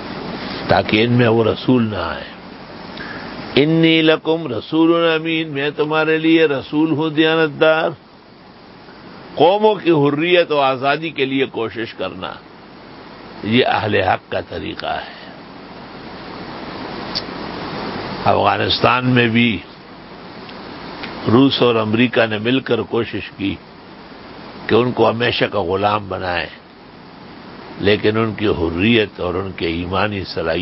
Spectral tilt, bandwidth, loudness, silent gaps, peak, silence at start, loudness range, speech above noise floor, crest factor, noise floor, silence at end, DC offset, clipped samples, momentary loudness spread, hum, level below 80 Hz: -10 dB/octave; 5.8 kHz; -17 LUFS; none; 0 dBFS; 0 s; 5 LU; 26 dB; 18 dB; -42 dBFS; 0 s; under 0.1%; under 0.1%; 21 LU; none; -44 dBFS